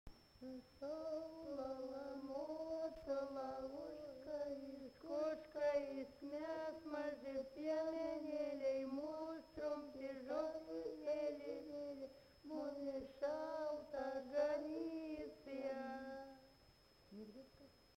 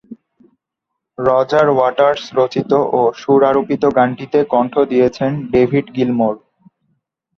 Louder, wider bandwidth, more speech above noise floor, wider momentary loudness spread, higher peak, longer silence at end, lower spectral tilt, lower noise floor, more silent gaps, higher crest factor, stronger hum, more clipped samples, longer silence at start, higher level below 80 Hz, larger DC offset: second, -47 LUFS vs -15 LUFS; first, 16 kHz vs 7 kHz; second, 24 dB vs 64 dB; first, 13 LU vs 5 LU; second, -30 dBFS vs 0 dBFS; second, 0.1 s vs 1 s; second, -5.5 dB/octave vs -7.5 dB/octave; second, -70 dBFS vs -78 dBFS; neither; about the same, 18 dB vs 14 dB; neither; neither; about the same, 0.05 s vs 0.1 s; second, -74 dBFS vs -52 dBFS; neither